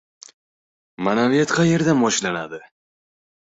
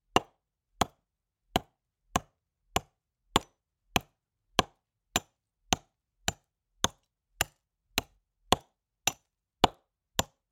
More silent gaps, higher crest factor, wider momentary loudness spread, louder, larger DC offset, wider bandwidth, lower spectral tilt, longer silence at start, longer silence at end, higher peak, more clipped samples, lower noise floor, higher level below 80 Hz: neither; second, 16 dB vs 30 dB; first, 12 LU vs 6 LU; first, -19 LUFS vs -33 LUFS; neither; second, 8.2 kHz vs 16.5 kHz; first, -5 dB/octave vs -2.5 dB/octave; first, 1 s vs 0.15 s; first, 1 s vs 0.3 s; about the same, -6 dBFS vs -6 dBFS; neither; first, under -90 dBFS vs -83 dBFS; second, -58 dBFS vs -52 dBFS